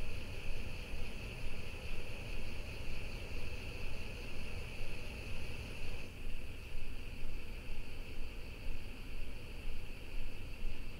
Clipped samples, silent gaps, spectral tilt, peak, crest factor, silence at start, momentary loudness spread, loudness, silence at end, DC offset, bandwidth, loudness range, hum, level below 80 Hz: under 0.1%; none; -5 dB/octave; -24 dBFS; 12 dB; 0 s; 3 LU; -47 LUFS; 0 s; under 0.1%; 11.5 kHz; 3 LU; none; -42 dBFS